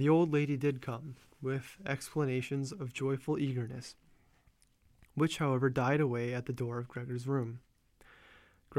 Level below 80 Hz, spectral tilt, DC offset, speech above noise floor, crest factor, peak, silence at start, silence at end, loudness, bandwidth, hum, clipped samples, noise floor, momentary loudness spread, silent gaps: -66 dBFS; -7 dB/octave; under 0.1%; 35 dB; 18 dB; -16 dBFS; 0 s; 0 s; -34 LUFS; 15 kHz; none; under 0.1%; -68 dBFS; 12 LU; none